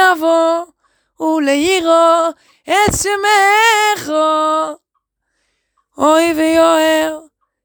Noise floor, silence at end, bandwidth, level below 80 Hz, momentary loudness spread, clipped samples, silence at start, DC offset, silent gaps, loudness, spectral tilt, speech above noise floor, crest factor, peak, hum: -70 dBFS; 0.45 s; over 20 kHz; -44 dBFS; 10 LU; under 0.1%; 0 s; under 0.1%; none; -13 LUFS; -3 dB/octave; 57 dB; 14 dB; 0 dBFS; none